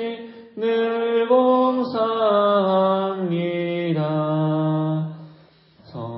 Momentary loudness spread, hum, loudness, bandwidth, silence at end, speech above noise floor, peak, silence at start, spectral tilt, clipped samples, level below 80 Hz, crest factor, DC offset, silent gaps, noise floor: 14 LU; none; -21 LUFS; 5.8 kHz; 0 s; 31 dB; -6 dBFS; 0 s; -12 dB/octave; under 0.1%; -70 dBFS; 16 dB; under 0.1%; none; -52 dBFS